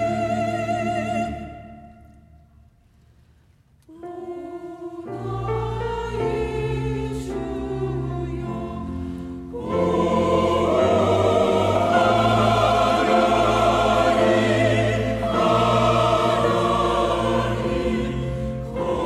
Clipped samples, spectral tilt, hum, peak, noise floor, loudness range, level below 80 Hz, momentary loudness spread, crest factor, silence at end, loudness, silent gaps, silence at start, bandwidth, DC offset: under 0.1%; -6 dB/octave; none; -6 dBFS; -56 dBFS; 15 LU; -38 dBFS; 15 LU; 16 dB; 0 s; -21 LUFS; none; 0 s; 14.5 kHz; under 0.1%